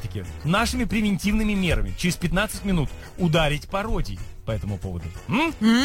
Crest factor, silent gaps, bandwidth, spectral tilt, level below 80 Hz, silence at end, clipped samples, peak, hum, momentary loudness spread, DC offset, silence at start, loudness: 14 dB; none; 16.5 kHz; -5.5 dB/octave; -32 dBFS; 0 s; under 0.1%; -8 dBFS; none; 10 LU; under 0.1%; 0 s; -24 LUFS